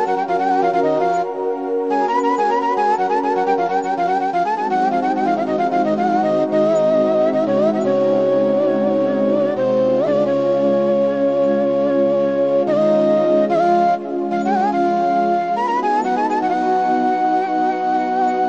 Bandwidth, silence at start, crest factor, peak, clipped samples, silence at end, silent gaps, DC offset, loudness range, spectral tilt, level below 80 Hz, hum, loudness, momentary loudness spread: 8 kHz; 0 s; 12 dB; -4 dBFS; under 0.1%; 0 s; none; 0.2%; 2 LU; -7 dB/octave; -66 dBFS; none; -17 LUFS; 3 LU